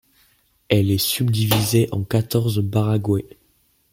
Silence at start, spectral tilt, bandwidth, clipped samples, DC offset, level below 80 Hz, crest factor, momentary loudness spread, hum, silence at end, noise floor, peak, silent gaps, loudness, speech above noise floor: 0.7 s; -5.5 dB/octave; 17 kHz; under 0.1%; under 0.1%; -50 dBFS; 18 dB; 4 LU; none; 0.65 s; -62 dBFS; -2 dBFS; none; -20 LUFS; 43 dB